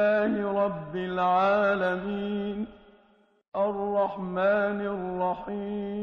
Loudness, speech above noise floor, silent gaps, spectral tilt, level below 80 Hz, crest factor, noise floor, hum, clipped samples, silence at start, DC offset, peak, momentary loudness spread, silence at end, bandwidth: -28 LUFS; 36 dB; 3.48-3.52 s; -5 dB/octave; -60 dBFS; 14 dB; -63 dBFS; none; under 0.1%; 0 s; under 0.1%; -14 dBFS; 10 LU; 0 s; 6.4 kHz